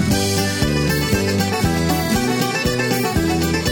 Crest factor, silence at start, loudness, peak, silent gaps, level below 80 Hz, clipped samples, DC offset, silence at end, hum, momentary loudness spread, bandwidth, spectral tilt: 14 dB; 0 s; -18 LUFS; -4 dBFS; none; -32 dBFS; under 0.1%; under 0.1%; 0 s; none; 1 LU; 19.5 kHz; -4.5 dB/octave